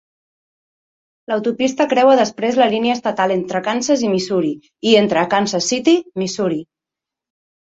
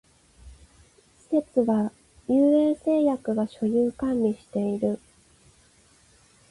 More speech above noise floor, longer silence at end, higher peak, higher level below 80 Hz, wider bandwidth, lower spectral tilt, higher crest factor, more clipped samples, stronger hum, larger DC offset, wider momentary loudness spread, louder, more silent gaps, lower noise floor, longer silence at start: first, 70 dB vs 35 dB; second, 1 s vs 1.55 s; first, -2 dBFS vs -10 dBFS; about the same, -62 dBFS vs -58 dBFS; second, 8.2 kHz vs 11.5 kHz; second, -4 dB/octave vs -8 dB/octave; about the same, 16 dB vs 16 dB; neither; neither; neither; about the same, 8 LU vs 9 LU; first, -17 LUFS vs -25 LUFS; neither; first, -86 dBFS vs -59 dBFS; first, 1.3 s vs 0.45 s